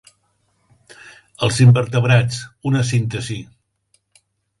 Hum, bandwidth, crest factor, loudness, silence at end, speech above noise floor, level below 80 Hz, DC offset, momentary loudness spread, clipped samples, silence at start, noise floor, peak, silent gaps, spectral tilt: none; 11.5 kHz; 18 dB; -17 LUFS; 1.15 s; 49 dB; -50 dBFS; under 0.1%; 14 LU; under 0.1%; 1.05 s; -65 dBFS; 0 dBFS; none; -6 dB/octave